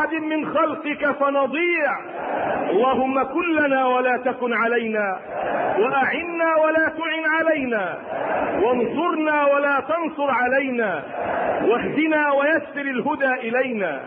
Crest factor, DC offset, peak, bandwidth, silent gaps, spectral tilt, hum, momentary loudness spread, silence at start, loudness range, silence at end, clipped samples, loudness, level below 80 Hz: 12 dB; under 0.1%; -8 dBFS; 4.8 kHz; none; -9.5 dB/octave; none; 6 LU; 0 s; 1 LU; 0 s; under 0.1%; -21 LUFS; -60 dBFS